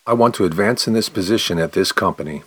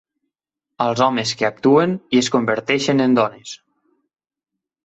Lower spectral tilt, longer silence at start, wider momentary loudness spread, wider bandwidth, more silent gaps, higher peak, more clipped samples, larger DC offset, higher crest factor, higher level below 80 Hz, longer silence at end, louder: about the same, -4.5 dB/octave vs -5 dB/octave; second, 0.05 s vs 0.8 s; second, 3 LU vs 8 LU; first, 19.5 kHz vs 8.2 kHz; neither; about the same, -2 dBFS vs -2 dBFS; neither; neither; about the same, 16 dB vs 18 dB; first, -50 dBFS vs -62 dBFS; second, 0.05 s vs 1.3 s; about the same, -18 LUFS vs -18 LUFS